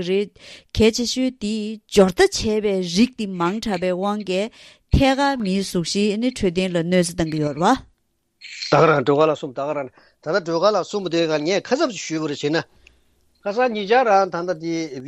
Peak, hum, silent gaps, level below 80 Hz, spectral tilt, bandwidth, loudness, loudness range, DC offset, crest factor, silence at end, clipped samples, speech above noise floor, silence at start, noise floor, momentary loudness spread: -2 dBFS; none; none; -40 dBFS; -5 dB/octave; 13.5 kHz; -20 LUFS; 2 LU; under 0.1%; 20 dB; 0 s; under 0.1%; 47 dB; 0 s; -67 dBFS; 10 LU